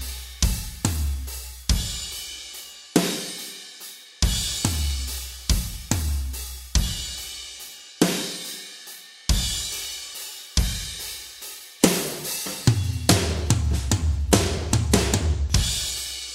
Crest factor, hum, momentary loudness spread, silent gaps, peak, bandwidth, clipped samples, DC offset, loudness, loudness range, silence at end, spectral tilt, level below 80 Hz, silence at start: 24 dB; none; 14 LU; none; 0 dBFS; 16.5 kHz; under 0.1%; under 0.1%; -25 LUFS; 6 LU; 0 s; -4 dB/octave; -30 dBFS; 0 s